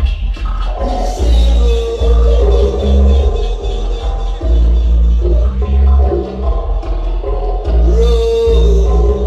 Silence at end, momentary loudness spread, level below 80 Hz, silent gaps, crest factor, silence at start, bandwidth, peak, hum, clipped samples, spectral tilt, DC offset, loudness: 0 s; 8 LU; -12 dBFS; none; 10 dB; 0 s; 7.6 kHz; 0 dBFS; none; under 0.1%; -7.5 dB/octave; under 0.1%; -14 LUFS